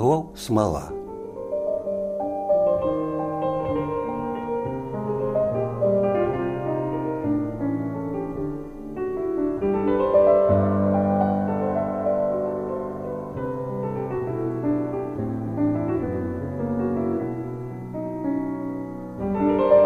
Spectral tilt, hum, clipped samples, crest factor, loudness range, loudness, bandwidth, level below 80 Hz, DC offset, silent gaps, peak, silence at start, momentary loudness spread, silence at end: -8.5 dB/octave; none; under 0.1%; 18 dB; 6 LU; -25 LUFS; 14 kHz; -48 dBFS; under 0.1%; none; -6 dBFS; 0 s; 10 LU; 0 s